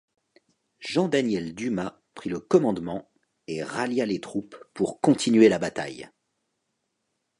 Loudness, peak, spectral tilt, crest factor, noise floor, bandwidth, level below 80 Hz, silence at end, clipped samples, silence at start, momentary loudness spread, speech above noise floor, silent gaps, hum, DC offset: -25 LUFS; -4 dBFS; -5.5 dB/octave; 22 dB; -78 dBFS; 11.5 kHz; -64 dBFS; 1.3 s; under 0.1%; 0.8 s; 17 LU; 54 dB; none; none; under 0.1%